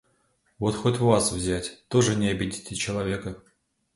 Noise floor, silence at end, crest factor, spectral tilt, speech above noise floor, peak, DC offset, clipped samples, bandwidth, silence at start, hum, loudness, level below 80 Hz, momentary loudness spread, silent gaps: -68 dBFS; 0.55 s; 22 dB; -5 dB/octave; 43 dB; -4 dBFS; under 0.1%; under 0.1%; 11.5 kHz; 0.6 s; none; -25 LUFS; -48 dBFS; 10 LU; none